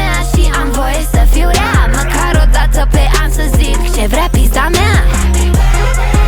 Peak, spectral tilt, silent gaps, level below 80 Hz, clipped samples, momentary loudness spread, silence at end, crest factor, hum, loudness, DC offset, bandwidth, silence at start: 0 dBFS; -4.5 dB/octave; none; -10 dBFS; under 0.1%; 3 LU; 0 s; 8 dB; none; -12 LUFS; under 0.1%; 19 kHz; 0 s